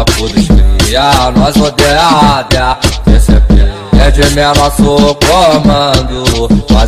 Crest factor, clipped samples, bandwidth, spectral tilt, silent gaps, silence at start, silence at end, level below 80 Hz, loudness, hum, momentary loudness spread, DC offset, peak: 6 dB; 1%; 15.5 kHz; -5 dB/octave; none; 0 s; 0 s; -12 dBFS; -8 LUFS; none; 4 LU; under 0.1%; 0 dBFS